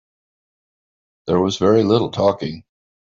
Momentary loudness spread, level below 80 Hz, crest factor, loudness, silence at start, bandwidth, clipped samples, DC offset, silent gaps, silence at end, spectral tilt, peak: 16 LU; -56 dBFS; 16 dB; -18 LUFS; 1.25 s; 7.6 kHz; under 0.1%; under 0.1%; none; 0.4 s; -6.5 dB/octave; -4 dBFS